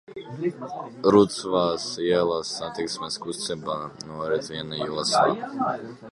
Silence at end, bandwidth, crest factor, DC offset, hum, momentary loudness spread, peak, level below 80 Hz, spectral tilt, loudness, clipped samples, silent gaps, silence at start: 0 s; 11.5 kHz; 22 dB; under 0.1%; none; 13 LU; -4 dBFS; -60 dBFS; -4.5 dB/octave; -25 LUFS; under 0.1%; none; 0.1 s